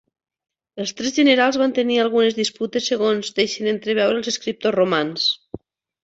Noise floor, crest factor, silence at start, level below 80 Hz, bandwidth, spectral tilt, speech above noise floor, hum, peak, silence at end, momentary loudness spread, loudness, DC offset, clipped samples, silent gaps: -39 dBFS; 18 dB; 0.75 s; -62 dBFS; 8 kHz; -3.5 dB/octave; 20 dB; none; -2 dBFS; 0.45 s; 12 LU; -20 LUFS; under 0.1%; under 0.1%; none